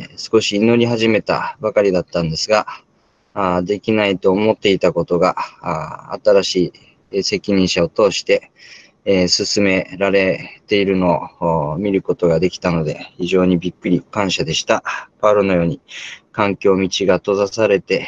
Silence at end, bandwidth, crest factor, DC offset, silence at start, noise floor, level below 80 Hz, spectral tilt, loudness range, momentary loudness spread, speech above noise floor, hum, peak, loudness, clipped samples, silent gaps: 0 s; 8.8 kHz; 16 dB; under 0.1%; 0 s; -58 dBFS; -52 dBFS; -5 dB/octave; 1 LU; 9 LU; 42 dB; none; -2 dBFS; -17 LUFS; under 0.1%; none